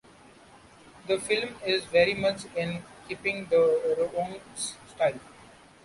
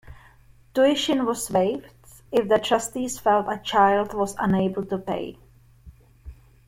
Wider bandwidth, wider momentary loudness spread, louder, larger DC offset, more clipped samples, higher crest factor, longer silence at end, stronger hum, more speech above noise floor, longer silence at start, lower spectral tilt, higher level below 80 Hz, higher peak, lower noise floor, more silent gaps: second, 11.5 kHz vs 16.5 kHz; about the same, 12 LU vs 10 LU; second, -27 LUFS vs -23 LUFS; neither; neither; about the same, 20 dB vs 18 dB; about the same, 0.4 s vs 0.35 s; neither; about the same, 27 dB vs 30 dB; first, 0.95 s vs 0.1 s; about the same, -3.5 dB/octave vs -4.5 dB/octave; second, -62 dBFS vs -52 dBFS; second, -10 dBFS vs -6 dBFS; about the same, -54 dBFS vs -53 dBFS; neither